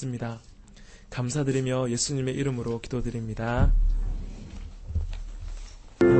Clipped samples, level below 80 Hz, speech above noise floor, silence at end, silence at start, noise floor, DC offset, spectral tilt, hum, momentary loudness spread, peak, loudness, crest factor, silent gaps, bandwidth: under 0.1%; -32 dBFS; 22 dB; 0 s; 0 s; -48 dBFS; under 0.1%; -6 dB/octave; none; 17 LU; -8 dBFS; -29 LUFS; 18 dB; none; 8.8 kHz